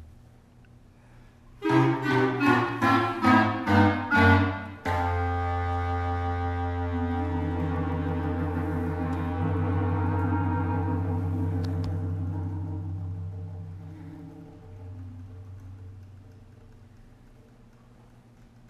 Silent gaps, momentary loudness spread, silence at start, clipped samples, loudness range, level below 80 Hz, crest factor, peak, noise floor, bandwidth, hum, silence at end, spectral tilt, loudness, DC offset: none; 22 LU; 0 s; under 0.1%; 21 LU; -52 dBFS; 20 dB; -8 dBFS; -53 dBFS; 11.5 kHz; none; 0.25 s; -8 dB/octave; -26 LUFS; under 0.1%